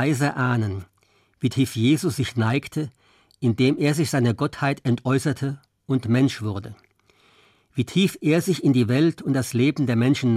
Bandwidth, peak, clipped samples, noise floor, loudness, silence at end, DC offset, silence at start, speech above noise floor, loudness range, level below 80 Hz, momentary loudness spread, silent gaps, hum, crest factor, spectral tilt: 15.5 kHz; -8 dBFS; under 0.1%; -63 dBFS; -22 LUFS; 0 s; under 0.1%; 0 s; 41 dB; 3 LU; -62 dBFS; 10 LU; none; none; 14 dB; -6.5 dB/octave